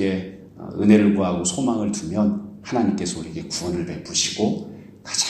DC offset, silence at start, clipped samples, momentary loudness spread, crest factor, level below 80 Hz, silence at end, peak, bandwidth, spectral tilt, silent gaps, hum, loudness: under 0.1%; 0 s; under 0.1%; 15 LU; 20 dB; -52 dBFS; 0 s; -2 dBFS; 12.5 kHz; -4.5 dB/octave; none; none; -22 LUFS